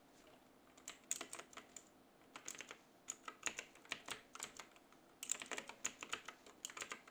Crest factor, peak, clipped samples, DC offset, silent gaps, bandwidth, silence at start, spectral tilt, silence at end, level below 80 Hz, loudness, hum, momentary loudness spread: 32 dB; -20 dBFS; under 0.1%; under 0.1%; none; over 20 kHz; 0 s; 0.5 dB/octave; 0 s; -82 dBFS; -49 LUFS; none; 20 LU